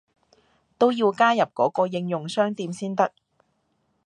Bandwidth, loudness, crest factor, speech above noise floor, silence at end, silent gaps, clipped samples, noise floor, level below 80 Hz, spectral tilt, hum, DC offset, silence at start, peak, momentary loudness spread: 11.5 kHz; -23 LUFS; 20 dB; 48 dB; 1 s; none; under 0.1%; -70 dBFS; -76 dBFS; -5.5 dB/octave; none; under 0.1%; 0.8 s; -6 dBFS; 8 LU